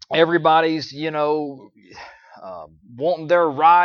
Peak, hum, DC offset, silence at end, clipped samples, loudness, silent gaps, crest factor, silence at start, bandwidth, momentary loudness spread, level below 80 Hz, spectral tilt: -2 dBFS; none; under 0.1%; 0 s; under 0.1%; -19 LUFS; none; 18 dB; 0.1 s; 6.8 kHz; 25 LU; -66 dBFS; -6 dB/octave